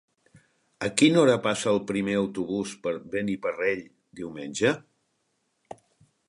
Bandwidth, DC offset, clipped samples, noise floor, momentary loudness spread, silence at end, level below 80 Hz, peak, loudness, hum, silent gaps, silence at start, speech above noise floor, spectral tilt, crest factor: 11.5 kHz; under 0.1%; under 0.1%; -74 dBFS; 14 LU; 1.5 s; -64 dBFS; -2 dBFS; -26 LUFS; none; none; 0.8 s; 49 dB; -4.5 dB/octave; 24 dB